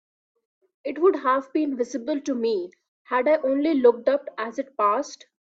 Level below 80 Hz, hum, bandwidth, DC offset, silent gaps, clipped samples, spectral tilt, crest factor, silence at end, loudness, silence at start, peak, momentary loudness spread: -72 dBFS; none; 7.8 kHz; under 0.1%; 2.88-3.05 s; under 0.1%; -4.5 dB/octave; 18 dB; 0.4 s; -23 LUFS; 0.85 s; -6 dBFS; 12 LU